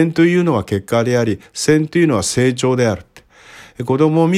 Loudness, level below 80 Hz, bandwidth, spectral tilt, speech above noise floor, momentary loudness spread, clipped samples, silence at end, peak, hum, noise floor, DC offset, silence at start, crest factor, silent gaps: -16 LUFS; -50 dBFS; 15 kHz; -5.5 dB/octave; 28 dB; 7 LU; under 0.1%; 0 s; 0 dBFS; none; -43 dBFS; under 0.1%; 0 s; 14 dB; none